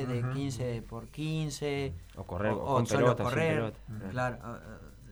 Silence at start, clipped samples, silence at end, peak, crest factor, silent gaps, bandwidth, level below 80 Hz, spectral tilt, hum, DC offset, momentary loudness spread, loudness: 0 s; under 0.1%; 0 s; -12 dBFS; 20 dB; none; 19.5 kHz; -52 dBFS; -6 dB/octave; none; under 0.1%; 17 LU; -32 LUFS